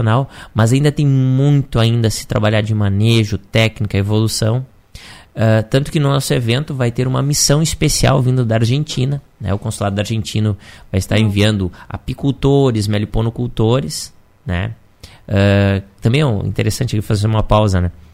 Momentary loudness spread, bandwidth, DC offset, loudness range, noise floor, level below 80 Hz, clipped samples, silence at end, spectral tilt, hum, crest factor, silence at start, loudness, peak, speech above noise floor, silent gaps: 9 LU; 16 kHz; under 0.1%; 3 LU; -38 dBFS; -34 dBFS; under 0.1%; 0.2 s; -5.5 dB/octave; none; 16 dB; 0 s; -16 LUFS; 0 dBFS; 23 dB; none